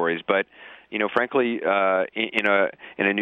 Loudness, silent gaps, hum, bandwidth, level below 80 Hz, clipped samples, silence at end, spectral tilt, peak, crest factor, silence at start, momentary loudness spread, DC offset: -23 LUFS; none; none; 8.6 kHz; -70 dBFS; under 0.1%; 0 s; -6 dB/octave; -6 dBFS; 18 dB; 0 s; 6 LU; under 0.1%